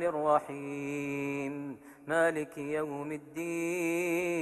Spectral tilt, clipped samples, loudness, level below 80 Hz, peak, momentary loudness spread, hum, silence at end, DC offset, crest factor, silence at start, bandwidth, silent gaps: -5.5 dB/octave; under 0.1%; -33 LUFS; -72 dBFS; -14 dBFS; 11 LU; none; 0 s; under 0.1%; 20 dB; 0 s; 12.5 kHz; none